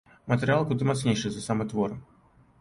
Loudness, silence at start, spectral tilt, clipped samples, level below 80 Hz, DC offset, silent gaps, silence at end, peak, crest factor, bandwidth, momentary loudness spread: -27 LUFS; 0.25 s; -6 dB/octave; under 0.1%; -56 dBFS; under 0.1%; none; 0.6 s; -10 dBFS; 18 dB; 11.5 kHz; 6 LU